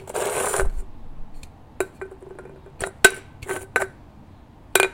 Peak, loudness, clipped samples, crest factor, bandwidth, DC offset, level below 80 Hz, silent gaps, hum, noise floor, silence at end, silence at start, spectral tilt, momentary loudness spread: 0 dBFS; -23 LUFS; under 0.1%; 26 dB; 17 kHz; under 0.1%; -36 dBFS; none; none; -46 dBFS; 0 s; 0 s; -2 dB/octave; 27 LU